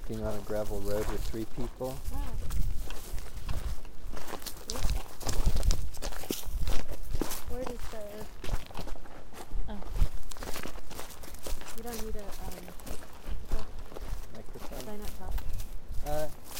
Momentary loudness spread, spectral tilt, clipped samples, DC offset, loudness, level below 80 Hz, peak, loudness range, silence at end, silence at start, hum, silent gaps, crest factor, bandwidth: 10 LU; -4.5 dB/octave; under 0.1%; under 0.1%; -39 LUFS; -34 dBFS; -6 dBFS; 7 LU; 0 s; 0 s; none; none; 20 dB; 16.5 kHz